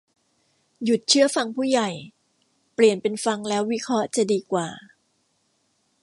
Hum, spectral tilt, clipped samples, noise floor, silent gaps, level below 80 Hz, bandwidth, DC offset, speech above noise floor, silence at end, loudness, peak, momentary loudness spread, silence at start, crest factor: none; -3.5 dB/octave; under 0.1%; -69 dBFS; none; -74 dBFS; 11.5 kHz; under 0.1%; 47 dB; 1.2 s; -22 LUFS; -4 dBFS; 13 LU; 0.8 s; 20 dB